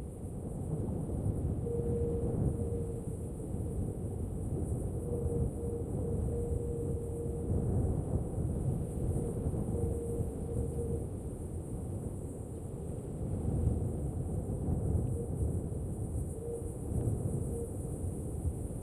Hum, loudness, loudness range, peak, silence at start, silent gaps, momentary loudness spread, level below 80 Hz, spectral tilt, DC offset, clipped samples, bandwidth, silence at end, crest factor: none; -36 LUFS; 3 LU; -20 dBFS; 0 s; none; 7 LU; -42 dBFS; -9.5 dB/octave; under 0.1%; under 0.1%; 14 kHz; 0 s; 14 dB